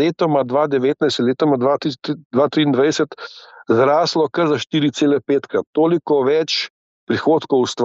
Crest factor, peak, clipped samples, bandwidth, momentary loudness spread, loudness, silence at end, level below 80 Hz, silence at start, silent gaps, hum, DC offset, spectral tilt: 14 dB; -4 dBFS; under 0.1%; 8 kHz; 7 LU; -17 LUFS; 0 s; -68 dBFS; 0 s; 2.25-2.30 s, 5.67-5.73 s, 6.70-7.07 s; none; under 0.1%; -5.5 dB/octave